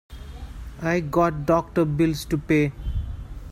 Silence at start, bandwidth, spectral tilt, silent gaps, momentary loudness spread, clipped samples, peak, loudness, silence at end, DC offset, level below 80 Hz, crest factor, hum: 0.1 s; 16 kHz; -7 dB/octave; none; 18 LU; under 0.1%; -8 dBFS; -23 LUFS; 0 s; under 0.1%; -36 dBFS; 16 dB; none